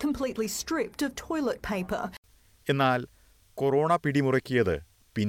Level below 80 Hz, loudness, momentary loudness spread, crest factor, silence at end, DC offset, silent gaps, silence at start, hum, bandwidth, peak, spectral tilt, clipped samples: -54 dBFS; -28 LUFS; 12 LU; 16 dB; 0 s; under 0.1%; 2.18-2.23 s; 0 s; none; 17.5 kHz; -12 dBFS; -5.5 dB/octave; under 0.1%